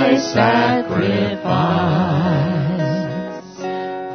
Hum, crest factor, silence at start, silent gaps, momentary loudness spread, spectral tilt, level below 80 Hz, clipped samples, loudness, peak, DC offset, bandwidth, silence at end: none; 18 dB; 0 s; none; 11 LU; -6.5 dB/octave; -50 dBFS; under 0.1%; -18 LUFS; 0 dBFS; under 0.1%; 6.6 kHz; 0 s